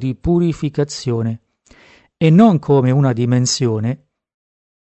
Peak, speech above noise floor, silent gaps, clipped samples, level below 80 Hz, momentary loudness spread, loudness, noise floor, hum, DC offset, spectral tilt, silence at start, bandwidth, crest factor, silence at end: 0 dBFS; 34 dB; none; under 0.1%; -42 dBFS; 12 LU; -16 LUFS; -49 dBFS; none; under 0.1%; -6.5 dB/octave; 0 s; 8.6 kHz; 16 dB; 0.95 s